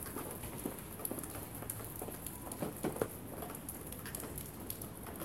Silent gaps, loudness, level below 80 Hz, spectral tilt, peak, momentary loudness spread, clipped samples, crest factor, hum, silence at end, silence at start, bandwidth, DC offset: none; -43 LUFS; -58 dBFS; -4.5 dB/octave; -18 dBFS; 5 LU; under 0.1%; 26 dB; none; 0 s; 0 s; 17 kHz; under 0.1%